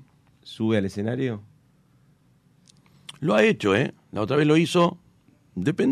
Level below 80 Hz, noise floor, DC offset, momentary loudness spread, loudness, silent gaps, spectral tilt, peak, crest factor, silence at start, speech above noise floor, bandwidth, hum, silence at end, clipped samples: -64 dBFS; -60 dBFS; under 0.1%; 18 LU; -23 LUFS; none; -6.5 dB/octave; -8 dBFS; 18 dB; 0.45 s; 38 dB; 13 kHz; none; 0 s; under 0.1%